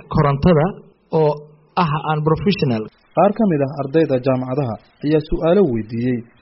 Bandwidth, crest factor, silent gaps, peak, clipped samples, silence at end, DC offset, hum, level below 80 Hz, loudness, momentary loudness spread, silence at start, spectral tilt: 5.8 kHz; 16 dB; none; -2 dBFS; under 0.1%; 0.2 s; under 0.1%; none; -38 dBFS; -18 LUFS; 8 LU; 0.1 s; -7 dB/octave